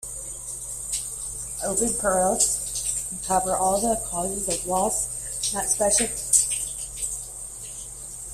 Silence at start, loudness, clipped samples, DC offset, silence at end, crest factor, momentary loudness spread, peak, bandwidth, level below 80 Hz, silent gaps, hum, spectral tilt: 0 s; -24 LUFS; under 0.1%; under 0.1%; 0 s; 24 dB; 13 LU; -2 dBFS; 16 kHz; -46 dBFS; none; none; -2 dB/octave